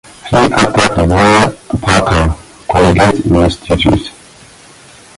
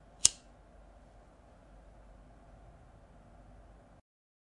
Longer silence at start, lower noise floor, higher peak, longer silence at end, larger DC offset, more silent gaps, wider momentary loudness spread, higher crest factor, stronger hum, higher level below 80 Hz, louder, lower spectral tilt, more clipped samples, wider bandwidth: about the same, 0.25 s vs 0.25 s; second, -38 dBFS vs -59 dBFS; about the same, 0 dBFS vs -2 dBFS; second, 1.1 s vs 4.15 s; neither; neither; second, 9 LU vs 31 LU; second, 12 dB vs 40 dB; neither; first, -24 dBFS vs -60 dBFS; first, -11 LUFS vs -28 LUFS; first, -5.5 dB/octave vs 0.5 dB/octave; neither; about the same, 11.5 kHz vs 11 kHz